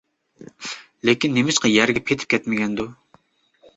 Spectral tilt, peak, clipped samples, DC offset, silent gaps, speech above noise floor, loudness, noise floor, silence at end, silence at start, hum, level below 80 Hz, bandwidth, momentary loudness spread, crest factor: -3.5 dB/octave; -2 dBFS; under 0.1%; under 0.1%; none; 39 dB; -20 LUFS; -59 dBFS; 0.85 s; 0.4 s; none; -56 dBFS; 8.2 kHz; 16 LU; 20 dB